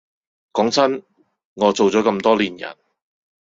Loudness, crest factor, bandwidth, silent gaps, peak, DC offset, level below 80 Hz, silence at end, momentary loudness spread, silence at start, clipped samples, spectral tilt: -18 LUFS; 18 dB; 8 kHz; 1.45-1.56 s; -2 dBFS; under 0.1%; -62 dBFS; 0.8 s; 13 LU; 0.55 s; under 0.1%; -4.5 dB/octave